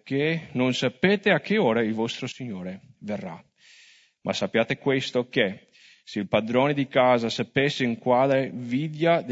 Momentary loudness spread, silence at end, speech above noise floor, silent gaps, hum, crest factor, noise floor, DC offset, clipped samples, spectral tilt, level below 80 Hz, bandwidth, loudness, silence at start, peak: 13 LU; 0 s; 32 dB; none; none; 20 dB; -56 dBFS; under 0.1%; under 0.1%; -6 dB/octave; -66 dBFS; 8 kHz; -24 LUFS; 0.05 s; -6 dBFS